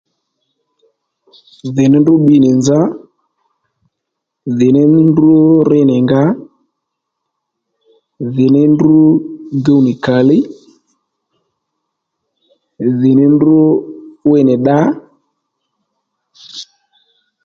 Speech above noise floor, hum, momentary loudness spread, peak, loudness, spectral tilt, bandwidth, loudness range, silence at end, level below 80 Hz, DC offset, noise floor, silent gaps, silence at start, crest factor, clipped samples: 66 dB; none; 16 LU; 0 dBFS; -10 LUFS; -8 dB/octave; 7.6 kHz; 5 LU; 0.8 s; -52 dBFS; under 0.1%; -76 dBFS; none; 1.65 s; 12 dB; under 0.1%